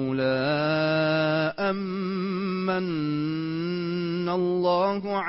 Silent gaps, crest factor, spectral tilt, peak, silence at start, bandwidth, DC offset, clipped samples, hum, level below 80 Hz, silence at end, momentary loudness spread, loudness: none; 12 dB; -10.5 dB/octave; -12 dBFS; 0 s; 5.8 kHz; under 0.1%; under 0.1%; none; -64 dBFS; 0 s; 6 LU; -26 LUFS